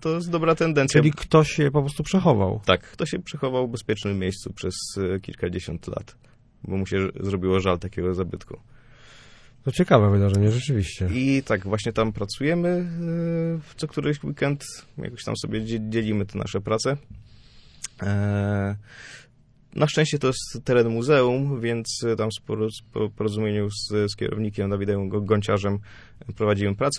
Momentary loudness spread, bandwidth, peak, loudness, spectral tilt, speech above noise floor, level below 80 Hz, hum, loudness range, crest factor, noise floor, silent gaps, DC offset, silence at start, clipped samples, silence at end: 12 LU; 11 kHz; -2 dBFS; -24 LUFS; -6 dB/octave; 30 dB; -48 dBFS; none; 6 LU; 22 dB; -54 dBFS; none; under 0.1%; 0 s; under 0.1%; 0 s